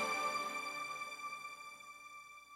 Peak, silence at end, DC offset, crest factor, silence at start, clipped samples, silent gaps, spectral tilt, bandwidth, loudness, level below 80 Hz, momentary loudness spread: -26 dBFS; 0 s; under 0.1%; 16 dB; 0 s; under 0.1%; none; -1 dB/octave; 16 kHz; -42 LUFS; -86 dBFS; 15 LU